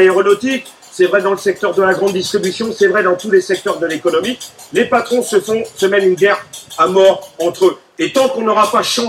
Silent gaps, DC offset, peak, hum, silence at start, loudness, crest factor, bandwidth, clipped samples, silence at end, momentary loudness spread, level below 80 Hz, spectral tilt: none; under 0.1%; 0 dBFS; none; 0 s; -14 LUFS; 14 dB; 15.5 kHz; under 0.1%; 0 s; 8 LU; -60 dBFS; -4 dB/octave